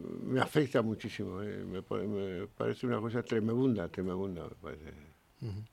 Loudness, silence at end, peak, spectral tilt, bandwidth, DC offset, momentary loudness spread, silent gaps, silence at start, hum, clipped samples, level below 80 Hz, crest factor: -35 LUFS; 0.05 s; -14 dBFS; -7 dB/octave; 16 kHz; under 0.1%; 15 LU; none; 0 s; none; under 0.1%; -62 dBFS; 22 dB